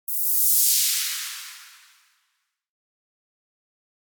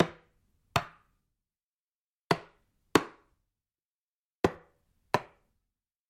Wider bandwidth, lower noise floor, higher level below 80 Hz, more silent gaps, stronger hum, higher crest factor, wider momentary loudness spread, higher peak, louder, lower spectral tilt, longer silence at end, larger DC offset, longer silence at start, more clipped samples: first, over 20 kHz vs 16 kHz; second, -75 dBFS vs under -90 dBFS; second, under -90 dBFS vs -60 dBFS; second, none vs 1.63-2.29 s, 3.84-4.44 s; neither; second, 20 dB vs 32 dB; first, 19 LU vs 14 LU; second, -8 dBFS vs -4 dBFS; first, -18 LUFS vs -32 LUFS; second, 11.5 dB/octave vs -5 dB/octave; first, 2.35 s vs 0.85 s; neither; about the same, 0.1 s vs 0 s; neither